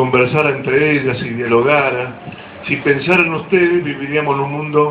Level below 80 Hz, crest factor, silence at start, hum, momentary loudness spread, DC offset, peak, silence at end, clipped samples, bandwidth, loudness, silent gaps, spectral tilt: -50 dBFS; 16 dB; 0 s; none; 9 LU; under 0.1%; 0 dBFS; 0 s; under 0.1%; 6 kHz; -15 LUFS; none; -8 dB/octave